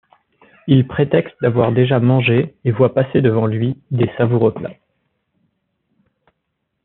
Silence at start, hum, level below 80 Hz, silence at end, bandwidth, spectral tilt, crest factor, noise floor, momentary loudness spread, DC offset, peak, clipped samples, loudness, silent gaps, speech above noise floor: 0.65 s; none; -54 dBFS; 2.1 s; 4.1 kHz; -7 dB/octave; 16 dB; -73 dBFS; 7 LU; under 0.1%; -2 dBFS; under 0.1%; -16 LUFS; none; 58 dB